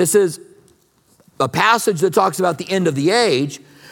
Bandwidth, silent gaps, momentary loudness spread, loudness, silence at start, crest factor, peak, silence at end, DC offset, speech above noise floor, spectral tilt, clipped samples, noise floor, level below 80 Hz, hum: 17.5 kHz; none; 9 LU; -17 LUFS; 0 s; 18 dB; 0 dBFS; 0.35 s; under 0.1%; 40 dB; -4 dB/octave; under 0.1%; -56 dBFS; -64 dBFS; none